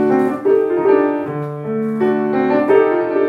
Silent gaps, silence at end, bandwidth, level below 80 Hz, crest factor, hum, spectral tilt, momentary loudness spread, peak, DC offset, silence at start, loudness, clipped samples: none; 0 s; 4.9 kHz; -68 dBFS; 14 dB; none; -8.5 dB/octave; 9 LU; -2 dBFS; under 0.1%; 0 s; -16 LUFS; under 0.1%